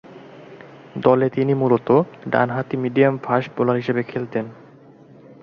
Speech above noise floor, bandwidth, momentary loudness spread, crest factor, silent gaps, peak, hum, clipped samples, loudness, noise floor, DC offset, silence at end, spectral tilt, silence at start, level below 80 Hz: 27 dB; 6.4 kHz; 9 LU; 18 dB; none; -2 dBFS; none; under 0.1%; -20 LUFS; -46 dBFS; under 0.1%; 0.1 s; -9.5 dB/octave; 0.1 s; -62 dBFS